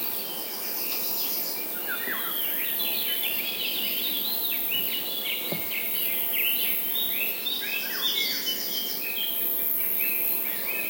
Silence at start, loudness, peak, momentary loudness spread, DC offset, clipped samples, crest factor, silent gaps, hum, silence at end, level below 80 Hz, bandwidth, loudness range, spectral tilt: 0 s; -25 LUFS; -10 dBFS; 4 LU; under 0.1%; under 0.1%; 18 dB; none; none; 0 s; -80 dBFS; 16.5 kHz; 1 LU; -0.5 dB/octave